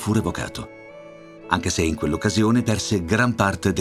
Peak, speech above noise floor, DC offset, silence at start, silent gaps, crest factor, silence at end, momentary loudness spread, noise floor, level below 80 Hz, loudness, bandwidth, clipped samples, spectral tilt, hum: 0 dBFS; 21 dB; under 0.1%; 0 s; none; 22 dB; 0 s; 22 LU; -42 dBFS; -42 dBFS; -22 LUFS; 14 kHz; under 0.1%; -5 dB/octave; none